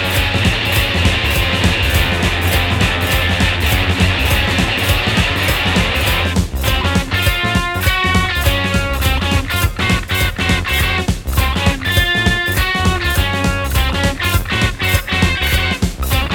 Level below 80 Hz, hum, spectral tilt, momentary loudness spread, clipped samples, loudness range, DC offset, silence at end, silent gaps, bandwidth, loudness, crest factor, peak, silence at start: -22 dBFS; none; -4 dB/octave; 3 LU; under 0.1%; 1 LU; under 0.1%; 0 s; none; 20 kHz; -15 LUFS; 14 dB; 0 dBFS; 0 s